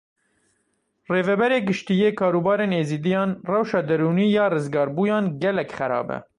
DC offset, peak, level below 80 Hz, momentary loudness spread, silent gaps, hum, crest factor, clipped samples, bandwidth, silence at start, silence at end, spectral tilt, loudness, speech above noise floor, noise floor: under 0.1%; -6 dBFS; -64 dBFS; 5 LU; none; none; 16 dB; under 0.1%; 10.5 kHz; 1.1 s; 0.15 s; -7.5 dB/octave; -22 LUFS; 50 dB; -71 dBFS